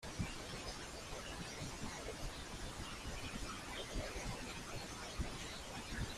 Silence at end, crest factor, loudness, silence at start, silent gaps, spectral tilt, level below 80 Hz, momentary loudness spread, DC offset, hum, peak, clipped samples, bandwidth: 0 s; 18 dB; -46 LUFS; 0 s; none; -3.5 dB/octave; -52 dBFS; 3 LU; under 0.1%; none; -28 dBFS; under 0.1%; 15.5 kHz